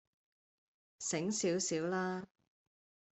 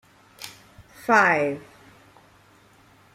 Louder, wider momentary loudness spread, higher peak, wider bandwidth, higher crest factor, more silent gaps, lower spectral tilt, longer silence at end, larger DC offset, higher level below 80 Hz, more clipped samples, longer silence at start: second, -37 LUFS vs -21 LUFS; second, 10 LU vs 23 LU; second, -24 dBFS vs -4 dBFS; second, 8.4 kHz vs 16 kHz; second, 16 dB vs 24 dB; neither; about the same, -3.5 dB/octave vs -4.5 dB/octave; second, 0.9 s vs 1.55 s; neither; second, -80 dBFS vs -64 dBFS; neither; first, 1 s vs 0.4 s